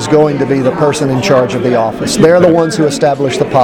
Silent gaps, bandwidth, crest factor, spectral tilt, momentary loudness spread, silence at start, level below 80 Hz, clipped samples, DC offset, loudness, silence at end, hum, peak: none; 17 kHz; 10 dB; -5.5 dB/octave; 5 LU; 0 s; -42 dBFS; 0.4%; under 0.1%; -10 LUFS; 0 s; none; 0 dBFS